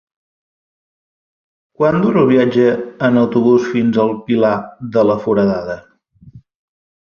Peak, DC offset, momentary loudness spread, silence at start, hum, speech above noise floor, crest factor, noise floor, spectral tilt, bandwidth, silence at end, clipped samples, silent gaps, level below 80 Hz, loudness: -2 dBFS; under 0.1%; 8 LU; 1.8 s; none; 29 dB; 14 dB; -43 dBFS; -8 dB/octave; 6.8 kHz; 0.75 s; under 0.1%; none; -52 dBFS; -14 LUFS